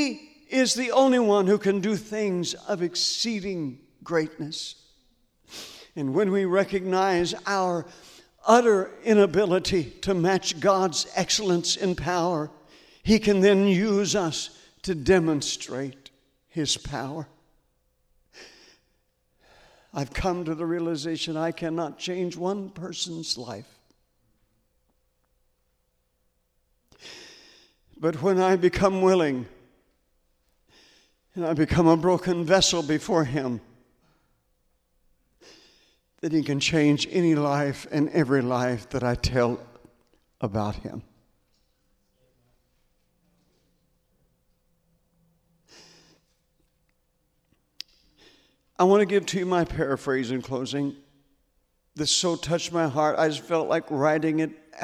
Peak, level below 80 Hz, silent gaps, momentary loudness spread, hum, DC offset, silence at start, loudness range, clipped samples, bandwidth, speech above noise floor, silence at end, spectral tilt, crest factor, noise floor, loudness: -2 dBFS; -50 dBFS; none; 15 LU; 60 Hz at -55 dBFS; under 0.1%; 0 s; 11 LU; under 0.1%; 14.5 kHz; 48 dB; 0 s; -4.5 dB/octave; 24 dB; -72 dBFS; -24 LUFS